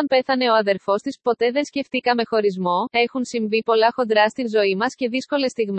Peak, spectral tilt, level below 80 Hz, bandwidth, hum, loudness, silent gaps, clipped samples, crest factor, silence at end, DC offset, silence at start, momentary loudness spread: -4 dBFS; -4.5 dB/octave; -70 dBFS; 8.8 kHz; none; -20 LUFS; none; under 0.1%; 16 dB; 0 s; under 0.1%; 0 s; 5 LU